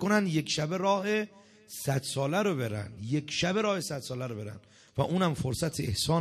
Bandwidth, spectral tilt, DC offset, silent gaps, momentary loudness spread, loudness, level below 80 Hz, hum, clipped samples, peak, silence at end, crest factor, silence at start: 14 kHz; -5 dB/octave; under 0.1%; none; 11 LU; -30 LUFS; -58 dBFS; none; under 0.1%; -12 dBFS; 0 s; 18 dB; 0 s